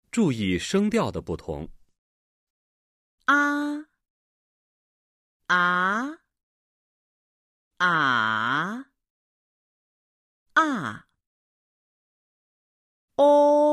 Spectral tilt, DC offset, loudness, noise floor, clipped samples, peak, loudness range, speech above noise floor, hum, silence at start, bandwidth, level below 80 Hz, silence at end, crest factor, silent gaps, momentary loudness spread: -5 dB/octave; under 0.1%; -23 LUFS; under -90 dBFS; under 0.1%; -6 dBFS; 6 LU; over 68 dB; none; 0.15 s; 12.5 kHz; -56 dBFS; 0 s; 20 dB; 1.98-3.18 s, 4.10-5.40 s, 6.43-7.71 s, 9.10-10.46 s, 11.27-13.08 s; 16 LU